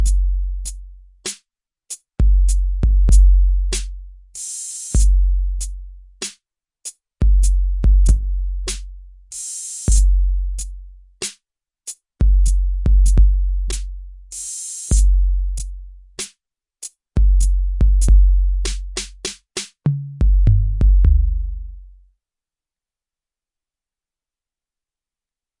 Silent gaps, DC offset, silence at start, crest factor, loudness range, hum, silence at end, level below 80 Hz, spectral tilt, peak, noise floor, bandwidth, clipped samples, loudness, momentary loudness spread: none; under 0.1%; 0 s; 14 dB; 5 LU; none; 3.75 s; -18 dBFS; -4.5 dB/octave; -2 dBFS; -89 dBFS; 11.5 kHz; under 0.1%; -20 LUFS; 18 LU